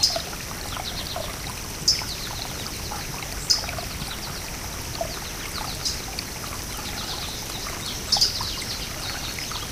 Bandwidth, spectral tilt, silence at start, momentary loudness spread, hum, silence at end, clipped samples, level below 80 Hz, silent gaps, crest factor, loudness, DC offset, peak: 16 kHz; -1.5 dB/octave; 0 s; 10 LU; none; 0 s; under 0.1%; -40 dBFS; none; 24 dB; -27 LUFS; under 0.1%; -4 dBFS